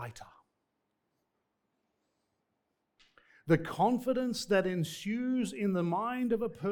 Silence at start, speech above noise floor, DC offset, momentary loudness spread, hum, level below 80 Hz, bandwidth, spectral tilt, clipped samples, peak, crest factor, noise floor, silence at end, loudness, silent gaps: 0 s; 51 dB; under 0.1%; 6 LU; none; -66 dBFS; 19 kHz; -6 dB/octave; under 0.1%; -14 dBFS; 20 dB; -82 dBFS; 0 s; -32 LUFS; none